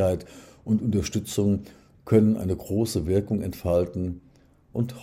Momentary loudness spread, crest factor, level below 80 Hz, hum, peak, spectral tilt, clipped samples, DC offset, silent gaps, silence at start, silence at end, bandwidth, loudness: 12 LU; 20 dB; -50 dBFS; none; -6 dBFS; -7 dB/octave; under 0.1%; under 0.1%; none; 0 s; 0 s; 16 kHz; -26 LUFS